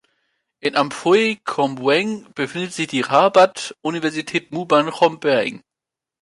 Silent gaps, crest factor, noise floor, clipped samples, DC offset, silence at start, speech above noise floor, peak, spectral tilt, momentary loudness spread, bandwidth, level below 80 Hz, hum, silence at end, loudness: none; 18 dB; -87 dBFS; under 0.1%; under 0.1%; 0.65 s; 68 dB; -2 dBFS; -4.5 dB/octave; 11 LU; 11.5 kHz; -68 dBFS; none; 0.65 s; -19 LUFS